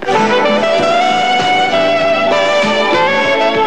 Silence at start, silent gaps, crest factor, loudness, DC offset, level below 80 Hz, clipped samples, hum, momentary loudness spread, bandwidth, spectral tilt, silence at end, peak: 0 s; none; 10 dB; -11 LUFS; 2%; -54 dBFS; under 0.1%; none; 1 LU; 11 kHz; -3.5 dB/octave; 0 s; -2 dBFS